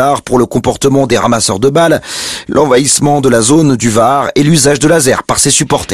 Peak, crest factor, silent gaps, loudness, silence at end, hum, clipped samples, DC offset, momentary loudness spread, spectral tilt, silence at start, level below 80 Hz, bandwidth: 0 dBFS; 10 dB; none; -9 LUFS; 0 s; none; under 0.1%; 0.8%; 4 LU; -4 dB/octave; 0 s; -38 dBFS; over 20 kHz